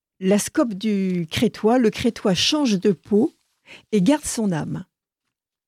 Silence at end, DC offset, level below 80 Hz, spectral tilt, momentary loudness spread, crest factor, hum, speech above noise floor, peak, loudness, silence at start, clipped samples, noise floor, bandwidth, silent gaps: 0.85 s; under 0.1%; -54 dBFS; -5 dB/octave; 6 LU; 16 dB; none; 62 dB; -6 dBFS; -21 LUFS; 0.2 s; under 0.1%; -83 dBFS; 15.5 kHz; none